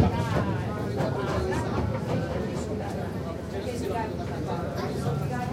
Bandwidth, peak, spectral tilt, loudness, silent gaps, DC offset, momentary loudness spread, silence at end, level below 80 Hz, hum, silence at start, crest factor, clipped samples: 16 kHz; -10 dBFS; -7 dB/octave; -30 LUFS; none; under 0.1%; 5 LU; 0 s; -44 dBFS; none; 0 s; 18 dB; under 0.1%